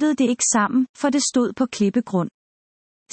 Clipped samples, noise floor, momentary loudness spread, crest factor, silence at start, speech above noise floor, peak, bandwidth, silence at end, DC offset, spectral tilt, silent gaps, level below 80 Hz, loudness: under 0.1%; under -90 dBFS; 7 LU; 14 dB; 0 s; over 70 dB; -6 dBFS; 8.8 kHz; 0.85 s; under 0.1%; -4 dB/octave; 0.89-0.94 s; -66 dBFS; -20 LUFS